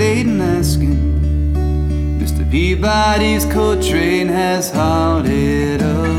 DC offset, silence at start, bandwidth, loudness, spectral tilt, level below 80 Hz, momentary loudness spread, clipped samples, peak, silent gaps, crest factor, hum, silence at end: under 0.1%; 0 s; 15.5 kHz; -15 LUFS; -6 dB/octave; -20 dBFS; 4 LU; under 0.1%; -2 dBFS; none; 12 dB; none; 0 s